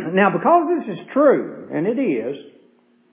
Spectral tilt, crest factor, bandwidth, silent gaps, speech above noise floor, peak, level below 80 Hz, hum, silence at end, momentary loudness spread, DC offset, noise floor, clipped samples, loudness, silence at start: -10.5 dB/octave; 16 dB; 3.8 kHz; none; 38 dB; -4 dBFS; -72 dBFS; none; 0.65 s; 11 LU; under 0.1%; -56 dBFS; under 0.1%; -19 LUFS; 0 s